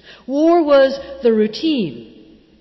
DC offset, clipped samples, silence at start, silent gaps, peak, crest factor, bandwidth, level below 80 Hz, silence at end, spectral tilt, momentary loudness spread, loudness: under 0.1%; under 0.1%; 0.3 s; none; -4 dBFS; 12 dB; 6 kHz; -54 dBFS; 0.55 s; -6.5 dB/octave; 10 LU; -16 LUFS